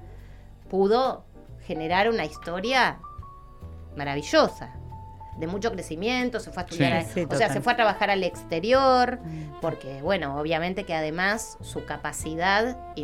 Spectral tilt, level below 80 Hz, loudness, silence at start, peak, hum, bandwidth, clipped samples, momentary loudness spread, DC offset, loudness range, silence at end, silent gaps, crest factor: -4.5 dB/octave; -46 dBFS; -25 LUFS; 0 s; -6 dBFS; none; 16 kHz; under 0.1%; 18 LU; under 0.1%; 5 LU; 0 s; none; 20 dB